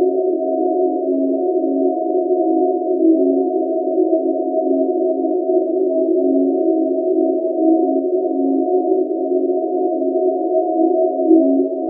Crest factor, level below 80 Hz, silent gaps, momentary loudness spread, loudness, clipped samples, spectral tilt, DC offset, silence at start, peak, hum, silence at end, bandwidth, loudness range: 14 dB; -90 dBFS; none; 4 LU; -17 LUFS; under 0.1%; 7 dB/octave; under 0.1%; 0 s; -2 dBFS; none; 0 s; 0.8 kHz; 1 LU